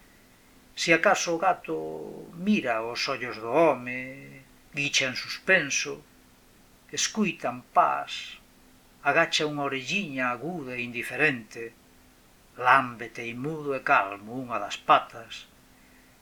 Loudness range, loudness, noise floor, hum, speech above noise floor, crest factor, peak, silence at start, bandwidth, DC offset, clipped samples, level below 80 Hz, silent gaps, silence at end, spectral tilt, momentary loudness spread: 3 LU; -26 LUFS; -57 dBFS; none; 30 dB; 24 dB; -4 dBFS; 0.75 s; 20 kHz; under 0.1%; under 0.1%; -64 dBFS; none; 0.75 s; -3 dB/octave; 17 LU